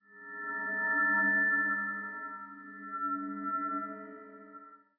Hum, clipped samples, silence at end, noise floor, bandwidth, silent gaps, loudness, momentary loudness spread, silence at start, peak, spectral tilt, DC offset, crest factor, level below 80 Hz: none; under 0.1%; 0.2 s; -54 dBFS; 2.6 kHz; none; -31 LUFS; 23 LU; 0.1 s; -20 dBFS; -9.5 dB/octave; under 0.1%; 14 dB; -90 dBFS